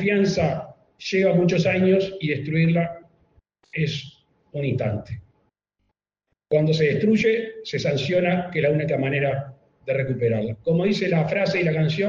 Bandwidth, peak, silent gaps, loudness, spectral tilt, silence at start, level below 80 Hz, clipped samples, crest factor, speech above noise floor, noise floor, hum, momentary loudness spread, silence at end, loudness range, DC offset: 7.2 kHz; -8 dBFS; none; -22 LUFS; -7 dB/octave; 0 s; -56 dBFS; under 0.1%; 14 dB; 57 dB; -78 dBFS; none; 13 LU; 0 s; 7 LU; under 0.1%